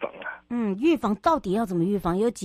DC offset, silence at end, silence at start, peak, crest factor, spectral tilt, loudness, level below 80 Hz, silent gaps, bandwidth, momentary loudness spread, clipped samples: under 0.1%; 0 s; 0 s; -8 dBFS; 16 dB; -6.5 dB/octave; -25 LUFS; -50 dBFS; none; 15 kHz; 9 LU; under 0.1%